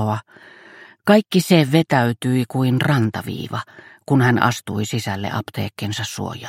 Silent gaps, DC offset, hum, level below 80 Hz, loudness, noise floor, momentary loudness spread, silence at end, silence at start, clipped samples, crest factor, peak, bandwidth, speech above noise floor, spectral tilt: none; under 0.1%; none; -58 dBFS; -19 LUFS; -45 dBFS; 12 LU; 0 s; 0 s; under 0.1%; 18 dB; 0 dBFS; 16.5 kHz; 26 dB; -6 dB/octave